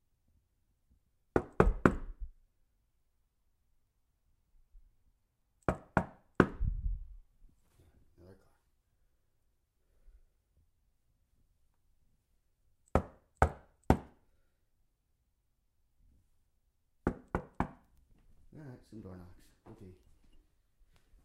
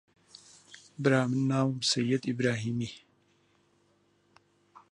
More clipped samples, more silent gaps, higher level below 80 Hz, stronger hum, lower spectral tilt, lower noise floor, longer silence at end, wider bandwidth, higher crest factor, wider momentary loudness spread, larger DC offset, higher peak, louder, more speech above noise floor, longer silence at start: neither; neither; first, -46 dBFS vs -72 dBFS; second, none vs 50 Hz at -70 dBFS; first, -8 dB/octave vs -5 dB/octave; first, -78 dBFS vs -69 dBFS; second, 1.3 s vs 1.95 s; first, 13.5 kHz vs 11 kHz; first, 32 dB vs 22 dB; about the same, 23 LU vs 25 LU; neither; first, -6 dBFS vs -10 dBFS; second, -35 LUFS vs -29 LUFS; second, 25 dB vs 41 dB; first, 1.35 s vs 0.7 s